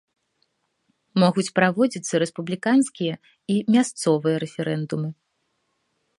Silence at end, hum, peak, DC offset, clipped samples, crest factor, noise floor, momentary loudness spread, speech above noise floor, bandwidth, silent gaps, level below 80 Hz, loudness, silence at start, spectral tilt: 1.05 s; none; -2 dBFS; under 0.1%; under 0.1%; 22 dB; -73 dBFS; 9 LU; 51 dB; 11.5 kHz; none; -70 dBFS; -22 LUFS; 1.15 s; -5.5 dB/octave